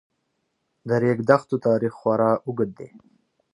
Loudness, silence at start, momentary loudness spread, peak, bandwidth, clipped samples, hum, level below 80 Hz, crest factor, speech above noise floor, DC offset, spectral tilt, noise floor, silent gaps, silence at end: -22 LUFS; 0.85 s; 17 LU; -2 dBFS; 10.5 kHz; under 0.1%; none; -66 dBFS; 22 dB; 53 dB; under 0.1%; -8.5 dB/octave; -74 dBFS; none; 0.65 s